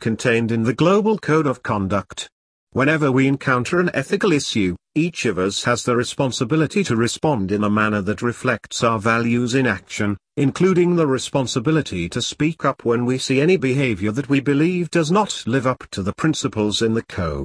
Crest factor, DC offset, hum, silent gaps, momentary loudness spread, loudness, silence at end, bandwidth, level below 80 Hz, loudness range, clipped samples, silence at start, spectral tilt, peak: 16 dB; under 0.1%; none; 2.32-2.67 s; 6 LU; -19 LUFS; 0 s; 11 kHz; -50 dBFS; 1 LU; under 0.1%; 0 s; -5.5 dB/octave; -2 dBFS